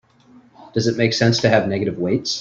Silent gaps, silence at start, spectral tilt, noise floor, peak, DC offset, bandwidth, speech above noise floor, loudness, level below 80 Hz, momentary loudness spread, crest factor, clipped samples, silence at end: none; 0.6 s; -5 dB/octave; -50 dBFS; -2 dBFS; under 0.1%; 7.6 kHz; 32 dB; -19 LUFS; -54 dBFS; 6 LU; 18 dB; under 0.1%; 0 s